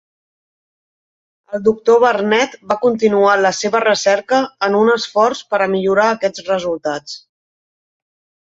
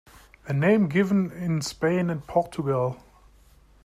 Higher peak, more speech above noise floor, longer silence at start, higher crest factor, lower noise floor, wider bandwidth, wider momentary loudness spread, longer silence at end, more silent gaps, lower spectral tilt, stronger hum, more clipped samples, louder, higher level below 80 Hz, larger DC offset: first, 0 dBFS vs -8 dBFS; first, over 75 dB vs 32 dB; first, 1.5 s vs 0.45 s; about the same, 16 dB vs 18 dB; first, under -90 dBFS vs -55 dBFS; second, 8 kHz vs 14.5 kHz; about the same, 9 LU vs 8 LU; first, 1.4 s vs 0.9 s; neither; second, -4 dB/octave vs -7 dB/octave; neither; neither; first, -15 LUFS vs -25 LUFS; second, -62 dBFS vs -56 dBFS; neither